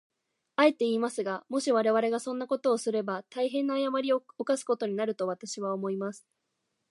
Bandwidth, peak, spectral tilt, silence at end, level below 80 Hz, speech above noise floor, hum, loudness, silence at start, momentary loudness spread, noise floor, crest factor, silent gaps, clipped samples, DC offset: 11.5 kHz; -10 dBFS; -4.5 dB/octave; 0.75 s; -86 dBFS; 52 dB; none; -29 LUFS; 0.6 s; 8 LU; -81 dBFS; 20 dB; none; under 0.1%; under 0.1%